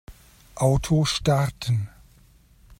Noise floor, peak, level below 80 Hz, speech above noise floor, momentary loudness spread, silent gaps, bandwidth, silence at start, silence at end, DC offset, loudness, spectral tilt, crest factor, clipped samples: -55 dBFS; -8 dBFS; -42 dBFS; 33 dB; 11 LU; none; 16 kHz; 0.1 s; 0.05 s; under 0.1%; -23 LUFS; -5.5 dB/octave; 18 dB; under 0.1%